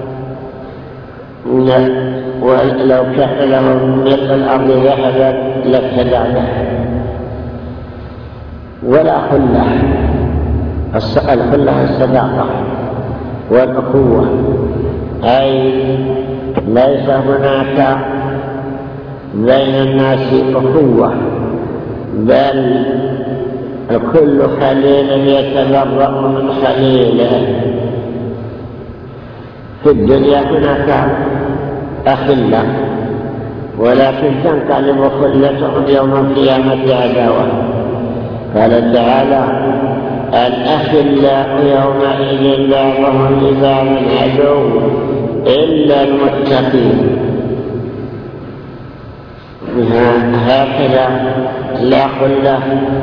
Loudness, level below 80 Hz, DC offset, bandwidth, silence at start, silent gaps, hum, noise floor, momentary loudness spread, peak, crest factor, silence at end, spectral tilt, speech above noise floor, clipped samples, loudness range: -12 LUFS; -32 dBFS; under 0.1%; 5.4 kHz; 0 s; none; none; -31 dBFS; 14 LU; 0 dBFS; 12 dB; 0 s; -9.5 dB/octave; 21 dB; 0.2%; 4 LU